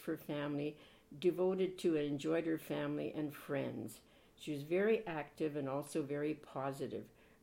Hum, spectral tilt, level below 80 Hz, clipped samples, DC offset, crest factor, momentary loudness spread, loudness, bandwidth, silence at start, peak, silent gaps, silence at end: none; -6.5 dB/octave; -74 dBFS; under 0.1%; under 0.1%; 16 dB; 11 LU; -39 LUFS; 16.5 kHz; 0 s; -22 dBFS; none; 0.35 s